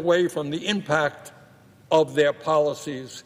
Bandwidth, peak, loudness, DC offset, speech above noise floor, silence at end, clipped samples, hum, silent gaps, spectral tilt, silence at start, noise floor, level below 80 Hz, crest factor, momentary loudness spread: 15.5 kHz; -8 dBFS; -23 LUFS; under 0.1%; 29 dB; 0.05 s; under 0.1%; none; none; -5 dB/octave; 0 s; -52 dBFS; -66 dBFS; 16 dB; 10 LU